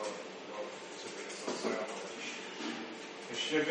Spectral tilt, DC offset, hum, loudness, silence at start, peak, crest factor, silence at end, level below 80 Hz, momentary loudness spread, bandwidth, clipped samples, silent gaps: -2.5 dB/octave; under 0.1%; none; -40 LUFS; 0 s; -20 dBFS; 20 dB; 0 s; -86 dBFS; 9 LU; 10 kHz; under 0.1%; none